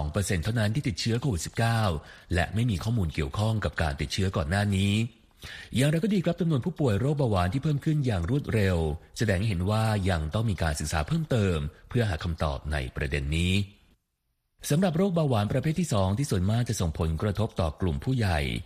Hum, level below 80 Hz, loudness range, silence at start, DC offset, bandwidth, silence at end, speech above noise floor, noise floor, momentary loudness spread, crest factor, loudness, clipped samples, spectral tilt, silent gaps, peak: none; -40 dBFS; 2 LU; 0 s; under 0.1%; 15 kHz; 0 s; 51 dB; -77 dBFS; 5 LU; 16 dB; -28 LUFS; under 0.1%; -6 dB/octave; none; -10 dBFS